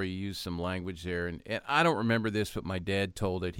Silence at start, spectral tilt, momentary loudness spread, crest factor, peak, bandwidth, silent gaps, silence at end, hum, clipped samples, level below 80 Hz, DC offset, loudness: 0 s; -5.5 dB/octave; 10 LU; 20 dB; -10 dBFS; 16.5 kHz; none; 0 s; none; under 0.1%; -54 dBFS; under 0.1%; -31 LUFS